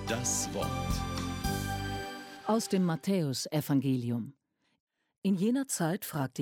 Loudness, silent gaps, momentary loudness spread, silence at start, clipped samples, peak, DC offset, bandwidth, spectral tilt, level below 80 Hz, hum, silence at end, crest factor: -32 LUFS; 4.80-4.87 s, 5.18-5.22 s; 7 LU; 0 s; under 0.1%; -16 dBFS; under 0.1%; 17 kHz; -5 dB/octave; -48 dBFS; none; 0 s; 16 dB